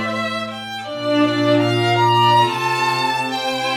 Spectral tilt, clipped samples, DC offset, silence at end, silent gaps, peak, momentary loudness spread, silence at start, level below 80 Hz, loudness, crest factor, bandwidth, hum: -5 dB/octave; under 0.1%; under 0.1%; 0 s; none; -4 dBFS; 11 LU; 0 s; -64 dBFS; -17 LUFS; 14 dB; 17.5 kHz; none